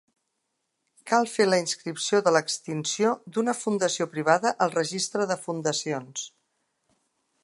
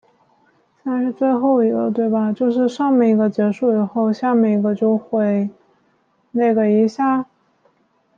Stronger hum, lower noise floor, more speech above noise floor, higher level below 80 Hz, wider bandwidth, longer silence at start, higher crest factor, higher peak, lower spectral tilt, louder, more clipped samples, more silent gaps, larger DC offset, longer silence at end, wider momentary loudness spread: neither; first, -79 dBFS vs -62 dBFS; first, 53 dB vs 45 dB; second, -78 dBFS vs -68 dBFS; first, 11.5 kHz vs 7.2 kHz; first, 1.05 s vs 0.85 s; first, 22 dB vs 12 dB; about the same, -4 dBFS vs -6 dBFS; second, -3.5 dB/octave vs -8.5 dB/octave; second, -26 LUFS vs -18 LUFS; neither; neither; neither; first, 1.15 s vs 0.95 s; about the same, 8 LU vs 7 LU